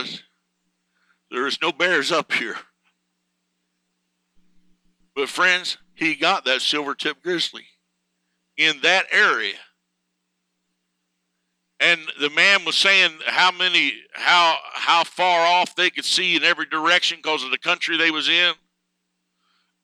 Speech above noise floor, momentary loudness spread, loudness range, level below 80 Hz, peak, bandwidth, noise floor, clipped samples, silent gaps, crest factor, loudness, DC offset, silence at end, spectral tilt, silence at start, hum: 56 dB; 11 LU; 8 LU; -78 dBFS; -2 dBFS; 15.5 kHz; -76 dBFS; under 0.1%; none; 20 dB; -18 LUFS; under 0.1%; 1.3 s; -1.5 dB/octave; 0 s; 60 Hz at -70 dBFS